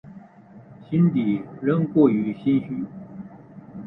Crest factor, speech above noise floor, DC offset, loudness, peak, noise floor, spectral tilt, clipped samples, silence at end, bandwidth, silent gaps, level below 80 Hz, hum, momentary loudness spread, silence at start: 18 dB; 26 dB; under 0.1%; -22 LUFS; -4 dBFS; -47 dBFS; -11.5 dB/octave; under 0.1%; 0 s; 4 kHz; none; -60 dBFS; none; 21 LU; 0.05 s